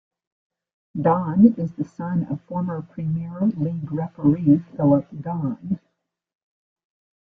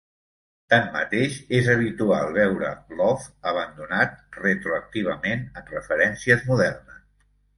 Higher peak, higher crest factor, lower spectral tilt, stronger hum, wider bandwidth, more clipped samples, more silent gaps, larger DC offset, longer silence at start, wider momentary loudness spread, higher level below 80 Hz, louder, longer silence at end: about the same, -2 dBFS vs -2 dBFS; about the same, 20 dB vs 22 dB; first, -12 dB/octave vs -6 dB/octave; second, none vs 50 Hz at -50 dBFS; second, 3.2 kHz vs 11.5 kHz; neither; neither; neither; first, 0.95 s vs 0.7 s; first, 12 LU vs 8 LU; second, -58 dBFS vs -52 dBFS; about the same, -22 LUFS vs -23 LUFS; first, 1.5 s vs 0.65 s